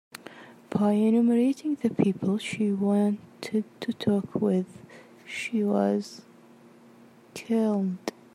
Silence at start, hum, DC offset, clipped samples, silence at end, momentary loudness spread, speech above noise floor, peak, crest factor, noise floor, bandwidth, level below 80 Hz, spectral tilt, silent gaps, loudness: 0.3 s; none; under 0.1%; under 0.1%; 0.25 s; 18 LU; 28 dB; -8 dBFS; 18 dB; -53 dBFS; 12.5 kHz; -72 dBFS; -7 dB/octave; none; -26 LUFS